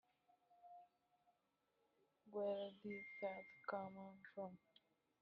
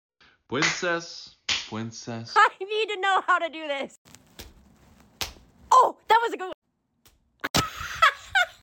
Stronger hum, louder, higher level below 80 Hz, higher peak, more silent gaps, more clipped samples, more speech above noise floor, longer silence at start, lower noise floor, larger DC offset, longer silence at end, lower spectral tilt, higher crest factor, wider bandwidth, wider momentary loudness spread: neither; second, -51 LUFS vs -24 LUFS; second, under -90 dBFS vs -56 dBFS; second, -32 dBFS vs -8 dBFS; second, none vs 3.98-4.05 s, 6.54-6.62 s, 7.50-7.54 s; neither; about the same, 36 dB vs 38 dB; about the same, 0.5 s vs 0.5 s; first, -86 dBFS vs -64 dBFS; neither; first, 0.65 s vs 0.1 s; first, -4 dB/octave vs -2.5 dB/octave; about the same, 22 dB vs 20 dB; second, 5.6 kHz vs 17 kHz; first, 19 LU vs 15 LU